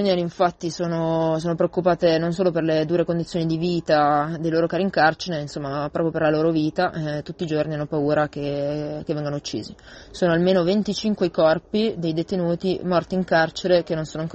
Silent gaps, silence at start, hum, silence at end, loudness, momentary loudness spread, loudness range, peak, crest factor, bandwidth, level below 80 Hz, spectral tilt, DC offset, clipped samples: none; 0 s; none; 0 s; -22 LUFS; 8 LU; 3 LU; -4 dBFS; 18 dB; 8.4 kHz; -52 dBFS; -6.5 dB/octave; under 0.1%; under 0.1%